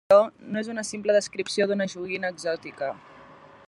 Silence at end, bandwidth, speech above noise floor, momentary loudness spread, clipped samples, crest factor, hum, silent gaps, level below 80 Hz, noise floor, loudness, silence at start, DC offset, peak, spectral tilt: 0.35 s; 11.5 kHz; 25 dB; 12 LU; under 0.1%; 20 dB; none; none; -70 dBFS; -49 dBFS; -26 LUFS; 0.1 s; under 0.1%; -6 dBFS; -4 dB/octave